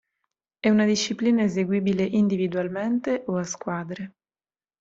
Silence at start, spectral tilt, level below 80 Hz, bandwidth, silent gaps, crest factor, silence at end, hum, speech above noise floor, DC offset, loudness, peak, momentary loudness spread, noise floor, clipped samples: 0.65 s; -5.5 dB/octave; -64 dBFS; 7.8 kHz; none; 18 dB; 0.7 s; none; over 67 dB; under 0.1%; -24 LUFS; -8 dBFS; 10 LU; under -90 dBFS; under 0.1%